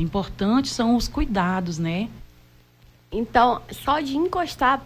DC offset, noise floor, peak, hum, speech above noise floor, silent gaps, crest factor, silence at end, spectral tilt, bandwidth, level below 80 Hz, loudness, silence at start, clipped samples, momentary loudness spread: under 0.1%; -54 dBFS; -6 dBFS; none; 31 dB; none; 18 dB; 0 s; -5.5 dB/octave; 16 kHz; -38 dBFS; -23 LUFS; 0 s; under 0.1%; 9 LU